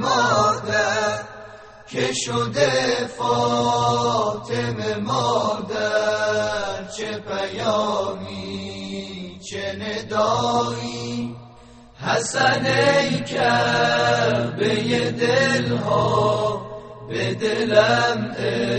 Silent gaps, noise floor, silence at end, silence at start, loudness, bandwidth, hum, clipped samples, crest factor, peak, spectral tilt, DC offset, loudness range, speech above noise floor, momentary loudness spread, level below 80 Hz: none; -46 dBFS; 0 s; 0 s; -21 LUFS; 8.8 kHz; none; under 0.1%; 20 dB; -2 dBFS; -4.5 dB/octave; under 0.1%; 6 LU; 25 dB; 13 LU; -54 dBFS